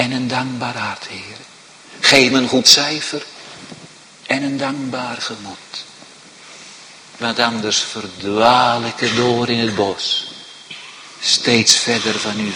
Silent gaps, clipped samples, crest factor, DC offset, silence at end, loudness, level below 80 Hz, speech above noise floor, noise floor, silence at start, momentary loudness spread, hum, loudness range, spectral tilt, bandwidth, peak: none; under 0.1%; 18 dB; under 0.1%; 0 s; -15 LUFS; -56 dBFS; 24 dB; -41 dBFS; 0 s; 24 LU; none; 10 LU; -2.5 dB/octave; 16 kHz; 0 dBFS